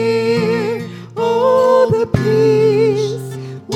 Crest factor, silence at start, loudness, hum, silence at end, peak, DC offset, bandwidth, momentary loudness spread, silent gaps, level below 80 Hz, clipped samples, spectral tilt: 14 dB; 0 s; -14 LUFS; none; 0 s; 0 dBFS; under 0.1%; 13 kHz; 13 LU; none; -44 dBFS; under 0.1%; -6.5 dB/octave